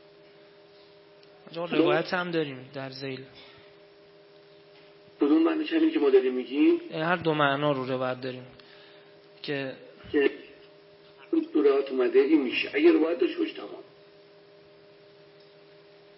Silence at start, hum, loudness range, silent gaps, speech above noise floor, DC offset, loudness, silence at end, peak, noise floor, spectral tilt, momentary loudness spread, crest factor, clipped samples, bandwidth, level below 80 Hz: 1.5 s; none; 8 LU; none; 28 dB; under 0.1%; -26 LUFS; 2.35 s; -8 dBFS; -54 dBFS; -10 dB/octave; 17 LU; 20 dB; under 0.1%; 5.8 kHz; -74 dBFS